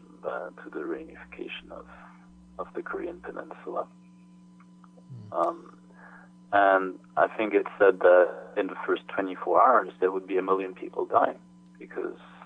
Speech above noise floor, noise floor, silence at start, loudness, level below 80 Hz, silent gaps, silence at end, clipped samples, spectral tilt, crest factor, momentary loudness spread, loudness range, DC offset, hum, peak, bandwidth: 26 dB; -53 dBFS; 0.25 s; -26 LUFS; -68 dBFS; none; 0 s; under 0.1%; -7 dB/octave; 20 dB; 20 LU; 15 LU; under 0.1%; 60 Hz at -55 dBFS; -8 dBFS; 4.8 kHz